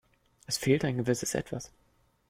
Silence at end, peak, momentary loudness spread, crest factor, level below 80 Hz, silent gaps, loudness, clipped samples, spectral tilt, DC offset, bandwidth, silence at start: 0.6 s; -12 dBFS; 13 LU; 20 dB; -60 dBFS; none; -30 LUFS; under 0.1%; -4.5 dB/octave; under 0.1%; 16.5 kHz; 0.5 s